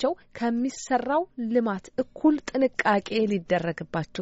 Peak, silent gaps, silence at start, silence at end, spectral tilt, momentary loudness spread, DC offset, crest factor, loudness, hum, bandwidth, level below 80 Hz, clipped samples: -8 dBFS; none; 0 s; 0 s; -4.5 dB/octave; 7 LU; under 0.1%; 18 dB; -26 LUFS; none; 8 kHz; -60 dBFS; under 0.1%